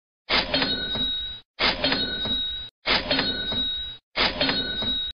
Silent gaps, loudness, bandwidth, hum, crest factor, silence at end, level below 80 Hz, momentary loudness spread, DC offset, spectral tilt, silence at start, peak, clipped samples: 1.45-1.54 s, 2.71-2.82 s, 4.03-4.11 s; -24 LUFS; 6.6 kHz; none; 18 dB; 0 s; -44 dBFS; 8 LU; 0.4%; -4.5 dB/octave; 0.25 s; -8 dBFS; under 0.1%